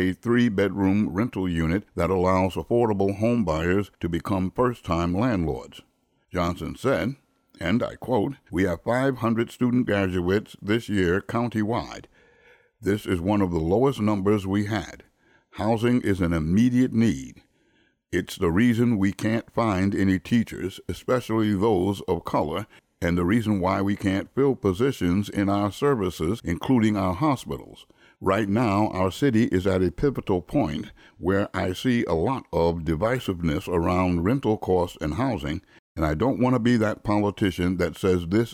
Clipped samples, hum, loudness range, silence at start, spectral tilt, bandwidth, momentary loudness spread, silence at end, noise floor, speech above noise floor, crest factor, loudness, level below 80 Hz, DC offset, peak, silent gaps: under 0.1%; none; 3 LU; 0 s; -7 dB/octave; 16 kHz; 8 LU; 0 s; -65 dBFS; 42 dB; 14 dB; -24 LUFS; -46 dBFS; under 0.1%; -10 dBFS; 35.79-35.95 s